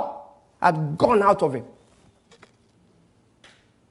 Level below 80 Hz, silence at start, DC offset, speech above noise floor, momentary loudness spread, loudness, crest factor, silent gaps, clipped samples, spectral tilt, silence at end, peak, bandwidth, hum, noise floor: -60 dBFS; 0 s; under 0.1%; 40 dB; 16 LU; -21 LUFS; 22 dB; none; under 0.1%; -7 dB/octave; 2.25 s; -4 dBFS; 11.5 kHz; none; -60 dBFS